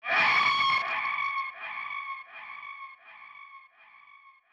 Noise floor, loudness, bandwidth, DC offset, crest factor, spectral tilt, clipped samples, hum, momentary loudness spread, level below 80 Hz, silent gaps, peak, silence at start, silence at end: -56 dBFS; -26 LUFS; 9.4 kHz; under 0.1%; 18 dB; -1.5 dB/octave; under 0.1%; none; 25 LU; -84 dBFS; none; -14 dBFS; 0.05 s; 0.25 s